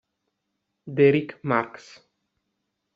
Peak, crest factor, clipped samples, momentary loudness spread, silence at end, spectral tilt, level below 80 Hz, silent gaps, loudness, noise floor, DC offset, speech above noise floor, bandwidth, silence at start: -6 dBFS; 22 dB; under 0.1%; 14 LU; 1.25 s; -6 dB/octave; -72 dBFS; none; -23 LUFS; -79 dBFS; under 0.1%; 56 dB; 7.2 kHz; 0.85 s